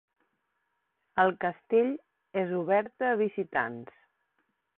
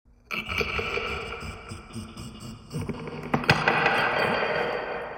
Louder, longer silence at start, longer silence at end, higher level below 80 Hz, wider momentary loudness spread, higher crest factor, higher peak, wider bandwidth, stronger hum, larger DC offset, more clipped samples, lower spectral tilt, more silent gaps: second, -29 LUFS vs -26 LUFS; first, 1.15 s vs 0.3 s; first, 0.95 s vs 0 s; second, -72 dBFS vs -48 dBFS; second, 9 LU vs 18 LU; about the same, 22 dB vs 24 dB; second, -10 dBFS vs -4 dBFS; second, 4.1 kHz vs 16.5 kHz; neither; neither; neither; first, -10 dB/octave vs -5 dB/octave; neither